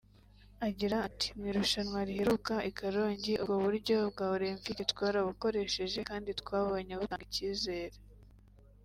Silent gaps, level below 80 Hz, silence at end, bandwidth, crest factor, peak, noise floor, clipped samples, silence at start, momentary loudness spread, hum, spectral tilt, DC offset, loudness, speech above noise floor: none; -56 dBFS; 0.7 s; 16 kHz; 20 dB; -14 dBFS; -60 dBFS; under 0.1%; 0.6 s; 7 LU; 50 Hz at -55 dBFS; -4.5 dB/octave; under 0.1%; -34 LUFS; 26 dB